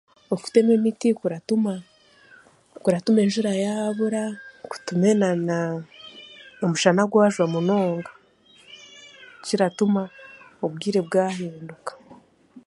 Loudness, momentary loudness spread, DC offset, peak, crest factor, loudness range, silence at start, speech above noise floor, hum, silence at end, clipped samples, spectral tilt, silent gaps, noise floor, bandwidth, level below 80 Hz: -23 LUFS; 22 LU; under 0.1%; -2 dBFS; 22 dB; 4 LU; 0.3 s; 34 dB; none; 0.05 s; under 0.1%; -6 dB/octave; none; -55 dBFS; 11.5 kHz; -70 dBFS